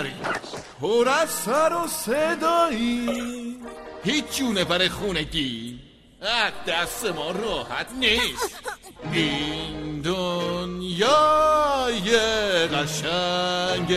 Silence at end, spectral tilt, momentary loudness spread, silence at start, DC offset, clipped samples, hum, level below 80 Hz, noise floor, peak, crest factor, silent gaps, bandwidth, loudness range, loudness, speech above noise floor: 0 s; -3.5 dB/octave; 11 LU; 0 s; under 0.1%; under 0.1%; none; -48 dBFS; -45 dBFS; -6 dBFS; 18 dB; none; 15.5 kHz; 4 LU; -23 LUFS; 22 dB